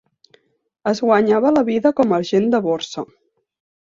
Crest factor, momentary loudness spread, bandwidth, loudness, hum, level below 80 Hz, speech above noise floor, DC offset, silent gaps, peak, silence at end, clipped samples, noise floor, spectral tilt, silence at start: 18 dB; 12 LU; 7.6 kHz; -17 LUFS; none; -60 dBFS; 49 dB; under 0.1%; none; -2 dBFS; 0.75 s; under 0.1%; -66 dBFS; -6 dB/octave; 0.85 s